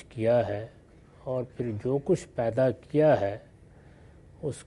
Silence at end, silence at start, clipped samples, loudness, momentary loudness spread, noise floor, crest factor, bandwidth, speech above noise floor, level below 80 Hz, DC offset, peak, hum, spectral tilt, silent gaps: 0.05 s; 0.1 s; under 0.1%; -28 LUFS; 14 LU; -53 dBFS; 16 dB; 11.5 kHz; 26 dB; -58 dBFS; under 0.1%; -12 dBFS; none; -7.5 dB/octave; none